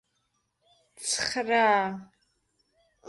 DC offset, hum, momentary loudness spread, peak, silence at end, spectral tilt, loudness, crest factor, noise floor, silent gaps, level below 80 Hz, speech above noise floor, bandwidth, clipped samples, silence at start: under 0.1%; none; 13 LU; -12 dBFS; 0 s; -2 dB/octave; -26 LUFS; 18 dB; -76 dBFS; none; -68 dBFS; 50 dB; 11.5 kHz; under 0.1%; 1 s